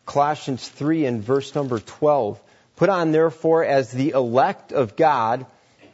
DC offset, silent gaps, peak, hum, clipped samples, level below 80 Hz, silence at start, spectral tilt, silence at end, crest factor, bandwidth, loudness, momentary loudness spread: under 0.1%; none; -4 dBFS; none; under 0.1%; -66 dBFS; 0.05 s; -6.5 dB/octave; 0.5 s; 16 dB; 8 kHz; -21 LUFS; 9 LU